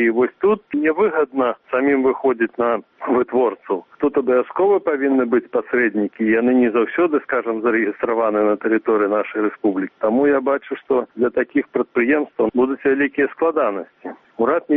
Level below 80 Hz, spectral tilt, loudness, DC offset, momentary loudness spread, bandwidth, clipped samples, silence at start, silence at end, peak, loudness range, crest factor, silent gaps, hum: -60 dBFS; -5 dB/octave; -19 LUFS; under 0.1%; 5 LU; 3.8 kHz; under 0.1%; 0 s; 0 s; -6 dBFS; 2 LU; 12 dB; none; none